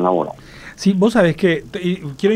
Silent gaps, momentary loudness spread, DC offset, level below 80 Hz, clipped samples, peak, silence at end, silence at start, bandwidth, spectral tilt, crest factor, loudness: none; 14 LU; under 0.1%; -46 dBFS; under 0.1%; -2 dBFS; 0 s; 0 s; 12 kHz; -6.5 dB/octave; 16 dB; -18 LUFS